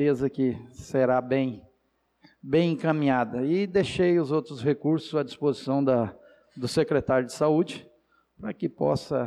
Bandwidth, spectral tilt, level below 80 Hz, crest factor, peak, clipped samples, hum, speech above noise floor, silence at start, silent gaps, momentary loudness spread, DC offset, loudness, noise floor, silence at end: 12.5 kHz; -7 dB/octave; -58 dBFS; 14 dB; -12 dBFS; under 0.1%; none; 46 dB; 0 s; none; 9 LU; under 0.1%; -26 LUFS; -71 dBFS; 0 s